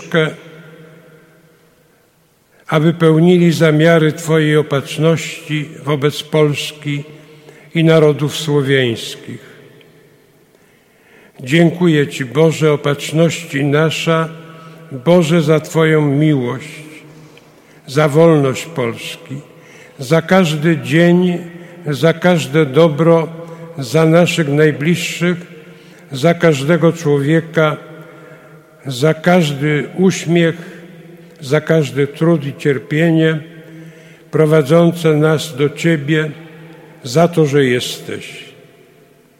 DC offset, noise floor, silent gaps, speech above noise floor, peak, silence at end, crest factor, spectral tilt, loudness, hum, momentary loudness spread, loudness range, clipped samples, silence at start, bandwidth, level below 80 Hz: under 0.1%; -54 dBFS; none; 41 dB; 0 dBFS; 0.9 s; 14 dB; -6.5 dB/octave; -14 LUFS; none; 16 LU; 4 LU; under 0.1%; 0 s; 15.5 kHz; -60 dBFS